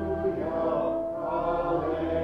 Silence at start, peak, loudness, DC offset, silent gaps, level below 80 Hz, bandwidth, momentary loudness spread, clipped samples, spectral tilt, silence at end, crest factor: 0 s; -16 dBFS; -28 LUFS; under 0.1%; none; -48 dBFS; 6.2 kHz; 2 LU; under 0.1%; -9 dB/octave; 0 s; 12 dB